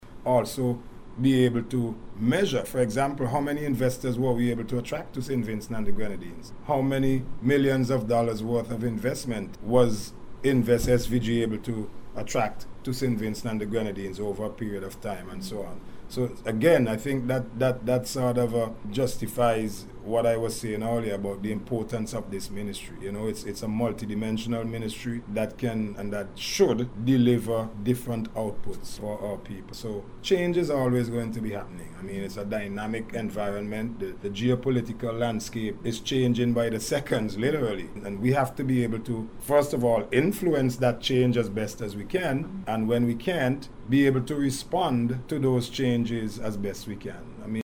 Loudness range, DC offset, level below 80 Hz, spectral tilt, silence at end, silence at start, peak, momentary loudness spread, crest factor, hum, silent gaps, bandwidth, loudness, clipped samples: 5 LU; under 0.1%; -46 dBFS; -6 dB/octave; 0 s; 0 s; -8 dBFS; 12 LU; 18 dB; none; none; 18.5 kHz; -27 LUFS; under 0.1%